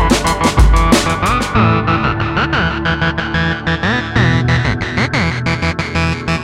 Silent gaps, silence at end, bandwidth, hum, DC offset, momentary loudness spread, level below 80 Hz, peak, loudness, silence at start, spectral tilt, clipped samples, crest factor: none; 0 s; 15.5 kHz; none; under 0.1%; 5 LU; -22 dBFS; 0 dBFS; -14 LUFS; 0 s; -5 dB/octave; under 0.1%; 14 dB